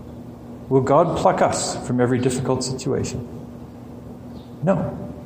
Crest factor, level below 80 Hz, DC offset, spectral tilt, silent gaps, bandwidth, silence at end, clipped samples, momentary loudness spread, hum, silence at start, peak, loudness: 18 dB; -46 dBFS; under 0.1%; -5.5 dB/octave; none; 15.5 kHz; 0 s; under 0.1%; 20 LU; none; 0 s; -4 dBFS; -21 LUFS